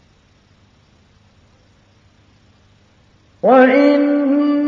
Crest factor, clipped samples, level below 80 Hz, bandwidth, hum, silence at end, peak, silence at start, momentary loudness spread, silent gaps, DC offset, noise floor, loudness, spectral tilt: 18 dB; under 0.1%; -60 dBFS; 5.2 kHz; none; 0 s; 0 dBFS; 3.45 s; 5 LU; none; under 0.1%; -53 dBFS; -13 LUFS; -7 dB/octave